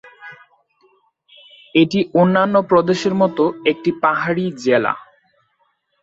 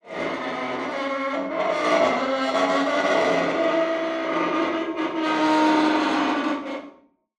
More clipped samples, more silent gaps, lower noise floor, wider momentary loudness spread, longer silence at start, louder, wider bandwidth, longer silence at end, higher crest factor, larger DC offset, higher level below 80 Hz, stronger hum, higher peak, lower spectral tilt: neither; neither; first, -65 dBFS vs -52 dBFS; about the same, 7 LU vs 8 LU; first, 0.2 s vs 0.05 s; first, -17 LUFS vs -23 LUFS; second, 8 kHz vs 11 kHz; first, 1 s vs 0.45 s; about the same, 16 dB vs 16 dB; neither; first, -60 dBFS vs -68 dBFS; neither; first, -2 dBFS vs -8 dBFS; first, -6.5 dB/octave vs -4 dB/octave